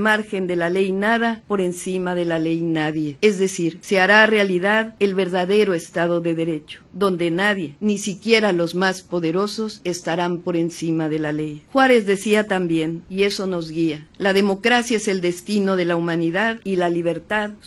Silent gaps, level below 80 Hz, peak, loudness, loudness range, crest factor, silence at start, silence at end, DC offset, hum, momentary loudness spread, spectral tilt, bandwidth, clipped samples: none; -58 dBFS; 0 dBFS; -20 LUFS; 3 LU; 18 dB; 0 s; 0.1 s; under 0.1%; none; 7 LU; -5 dB/octave; 12.5 kHz; under 0.1%